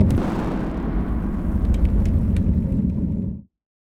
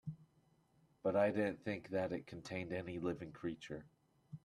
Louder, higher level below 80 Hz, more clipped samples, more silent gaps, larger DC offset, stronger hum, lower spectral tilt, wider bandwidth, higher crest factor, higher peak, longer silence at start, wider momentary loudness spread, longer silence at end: first, -23 LUFS vs -41 LUFS; first, -24 dBFS vs -74 dBFS; neither; neither; neither; neither; first, -9.5 dB/octave vs -7 dB/octave; second, 9 kHz vs 12 kHz; about the same, 16 dB vs 20 dB; first, -4 dBFS vs -22 dBFS; about the same, 0 s vs 0.05 s; second, 5 LU vs 16 LU; first, 0.55 s vs 0.05 s